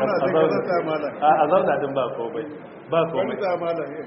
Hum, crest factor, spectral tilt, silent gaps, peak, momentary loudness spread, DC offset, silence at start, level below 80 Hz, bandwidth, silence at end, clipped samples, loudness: none; 16 dB; -4.5 dB/octave; none; -6 dBFS; 11 LU; under 0.1%; 0 s; -66 dBFS; 5.8 kHz; 0 s; under 0.1%; -22 LUFS